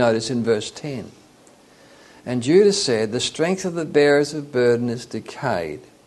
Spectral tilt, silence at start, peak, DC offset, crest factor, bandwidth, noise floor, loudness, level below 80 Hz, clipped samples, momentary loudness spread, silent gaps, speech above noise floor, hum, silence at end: -4.5 dB/octave; 0 s; -4 dBFS; under 0.1%; 18 dB; 12 kHz; -51 dBFS; -20 LUFS; -60 dBFS; under 0.1%; 16 LU; none; 31 dB; none; 0.25 s